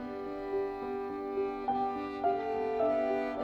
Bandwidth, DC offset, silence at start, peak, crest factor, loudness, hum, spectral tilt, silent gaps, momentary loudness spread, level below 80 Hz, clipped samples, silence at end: 7 kHz; under 0.1%; 0 s; -18 dBFS; 14 dB; -34 LUFS; none; -7 dB/octave; none; 7 LU; -60 dBFS; under 0.1%; 0 s